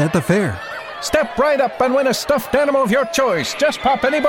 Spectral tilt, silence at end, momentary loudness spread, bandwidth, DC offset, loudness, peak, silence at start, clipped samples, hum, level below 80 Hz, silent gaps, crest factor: -4.5 dB/octave; 0 s; 4 LU; 16.5 kHz; under 0.1%; -17 LUFS; -2 dBFS; 0 s; under 0.1%; none; -46 dBFS; none; 16 dB